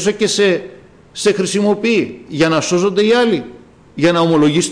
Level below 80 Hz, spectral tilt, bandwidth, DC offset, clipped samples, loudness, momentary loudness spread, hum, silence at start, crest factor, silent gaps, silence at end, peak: -52 dBFS; -4.5 dB/octave; 10.5 kHz; under 0.1%; under 0.1%; -15 LUFS; 9 LU; none; 0 s; 10 dB; none; 0 s; -4 dBFS